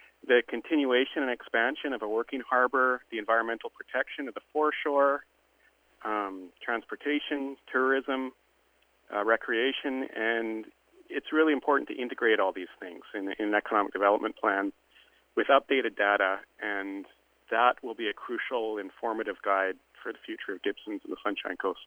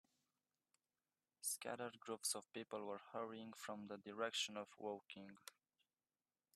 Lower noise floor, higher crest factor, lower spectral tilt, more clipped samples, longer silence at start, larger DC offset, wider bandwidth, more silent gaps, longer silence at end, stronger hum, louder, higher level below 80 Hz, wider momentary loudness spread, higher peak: second, -68 dBFS vs under -90 dBFS; about the same, 22 dB vs 22 dB; first, -5 dB/octave vs -1.5 dB/octave; neither; second, 0.25 s vs 1.4 s; neither; first, over 20 kHz vs 15 kHz; neither; second, 0 s vs 1.05 s; neither; first, -29 LUFS vs -48 LUFS; first, -74 dBFS vs under -90 dBFS; about the same, 12 LU vs 12 LU; first, -8 dBFS vs -28 dBFS